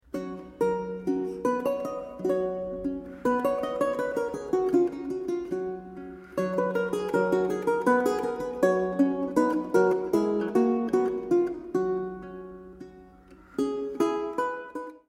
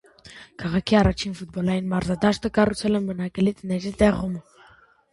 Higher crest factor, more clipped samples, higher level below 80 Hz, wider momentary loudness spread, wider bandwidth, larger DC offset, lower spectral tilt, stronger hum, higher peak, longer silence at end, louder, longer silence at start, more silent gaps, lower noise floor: about the same, 18 dB vs 20 dB; neither; second, -58 dBFS vs -40 dBFS; about the same, 12 LU vs 11 LU; first, 15.5 kHz vs 11.5 kHz; neither; about the same, -6.5 dB/octave vs -6.5 dB/octave; neither; second, -10 dBFS vs -4 dBFS; second, 0.1 s vs 0.7 s; second, -28 LUFS vs -23 LUFS; about the same, 0.15 s vs 0.25 s; neither; about the same, -52 dBFS vs -54 dBFS